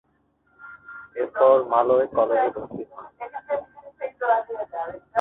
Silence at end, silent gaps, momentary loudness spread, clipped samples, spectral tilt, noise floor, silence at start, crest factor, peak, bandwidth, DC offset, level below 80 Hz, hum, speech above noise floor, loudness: 0 s; none; 20 LU; under 0.1%; -8 dB/octave; -66 dBFS; 0.6 s; 20 dB; -4 dBFS; 3.9 kHz; under 0.1%; -64 dBFS; none; 45 dB; -23 LUFS